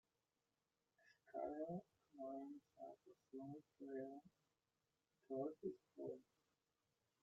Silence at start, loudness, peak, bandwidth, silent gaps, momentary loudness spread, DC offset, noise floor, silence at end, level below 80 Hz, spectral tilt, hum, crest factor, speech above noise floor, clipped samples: 1.05 s; -54 LUFS; -36 dBFS; 7.4 kHz; none; 11 LU; under 0.1%; under -90 dBFS; 1 s; under -90 dBFS; -8.5 dB/octave; none; 20 dB; over 37 dB; under 0.1%